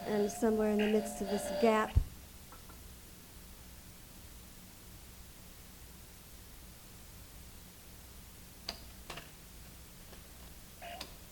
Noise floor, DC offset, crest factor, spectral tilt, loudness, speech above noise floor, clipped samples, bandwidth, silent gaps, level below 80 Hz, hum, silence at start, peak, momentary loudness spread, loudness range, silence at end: -53 dBFS; under 0.1%; 24 dB; -5.5 dB/octave; -35 LUFS; 22 dB; under 0.1%; 19 kHz; none; -50 dBFS; none; 0 s; -16 dBFS; 21 LU; 18 LU; 0 s